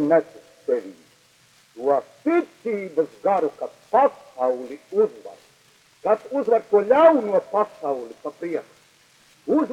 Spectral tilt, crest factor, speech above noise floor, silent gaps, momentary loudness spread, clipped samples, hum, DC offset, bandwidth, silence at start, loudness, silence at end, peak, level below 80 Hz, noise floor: -6.5 dB/octave; 20 dB; 35 dB; none; 14 LU; under 0.1%; none; under 0.1%; 11.5 kHz; 0 s; -22 LUFS; 0 s; -4 dBFS; -72 dBFS; -57 dBFS